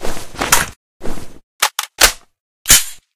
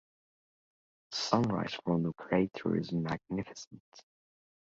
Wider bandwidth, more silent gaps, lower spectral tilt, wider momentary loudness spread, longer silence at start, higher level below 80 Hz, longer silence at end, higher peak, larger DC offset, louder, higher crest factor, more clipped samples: first, over 20 kHz vs 7.8 kHz; first, 0.76-1.00 s, 1.43-1.59 s, 2.40-2.65 s vs 3.67-3.71 s, 3.80-3.92 s; second, 0 dB/octave vs -6 dB/octave; first, 22 LU vs 11 LU; second, 0 s vs 1.1 s; first, -30 dBFS vs -64 dBFS; second, 0.2 s vs 0.7 s; first, 0 dBFS vs -10 dBFS; neither; first, -13 LUFS vs -33 LUFS; second, 16 dB vs 26 dB; first, 0.3% vs under 0.1%